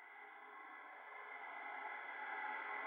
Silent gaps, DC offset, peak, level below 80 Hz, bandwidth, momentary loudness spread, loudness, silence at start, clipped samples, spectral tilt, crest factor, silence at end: none; under 0.1%; -34 dBFS; under -90 dBFS; 16 kHz; 11 LU; -49 LUFS; 0 s; under 0.1%; -1.5 dB/octave; 16 dB; 0 s